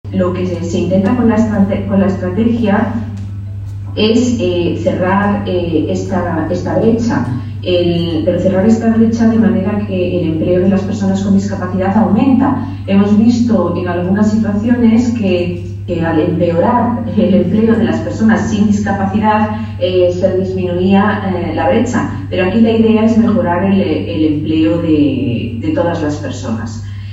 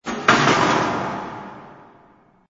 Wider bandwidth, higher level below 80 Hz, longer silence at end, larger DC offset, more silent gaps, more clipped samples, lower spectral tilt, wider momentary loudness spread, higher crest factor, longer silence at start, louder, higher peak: about the same, 7.8 kHz vs 8 kHz; first, -36 dBFS vs -52 dBFS; second, 0 s vs 0.75 s; neither; neither; neither; first, -7.5 dB/octave vs -4 dB/octave; second, 7 LU vs 20 LU; second, 12 dB vs 22 dB; about the same, 0.05 s vs 0.05 s; first, -13 LUFS vs -18 LUFS; about the same, 0 dBFS vs 0 dBFS